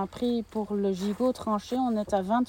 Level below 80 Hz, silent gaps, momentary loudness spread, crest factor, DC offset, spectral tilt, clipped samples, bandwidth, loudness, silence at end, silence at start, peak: -56 dBFS; none; 4 LU; 16 dB; under 0.1%; -6.5 dB/octave; under 0.1%; 17 kHz; -29 LUFS; 0 s; 0 s; -12 dBFS